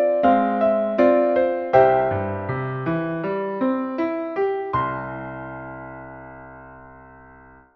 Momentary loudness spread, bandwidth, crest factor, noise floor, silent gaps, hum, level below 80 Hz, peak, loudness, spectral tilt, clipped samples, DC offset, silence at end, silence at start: 21 LU; 6 kHz; 20 dB; -48 dBFS; none; none; -54 dBFS; -2 dBFS; -21 LUFS; -9.5 dB/octave; under 0.1%; under 0.1%; 0.5 s; 0 s